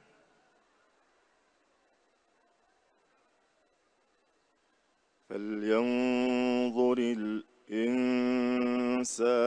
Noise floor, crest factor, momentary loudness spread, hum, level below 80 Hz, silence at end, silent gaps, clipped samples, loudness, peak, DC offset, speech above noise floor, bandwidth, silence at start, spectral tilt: -72 dBFS; 18 dB; 9 LU; none; -78 dBFS; 0 s; none; under 0.1%; -30 LUFS; -14 dBFS; under 0.1%; 43 dB; 10.5 kHz; 5.3 s; -4.5 dB/octave